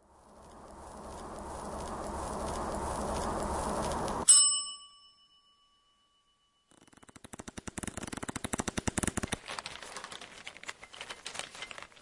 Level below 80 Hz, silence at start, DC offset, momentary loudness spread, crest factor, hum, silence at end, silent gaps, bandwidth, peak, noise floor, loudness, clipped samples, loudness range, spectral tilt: -50 dBFS; 0.25 s; under 0.1%; 19 LU; 26 dB; none; 0 s; none; 11.5 kHz; -8 dBFS; -72 dBFS; -31 LUFS; under 0.1%; 17 LU; -2 dB/octave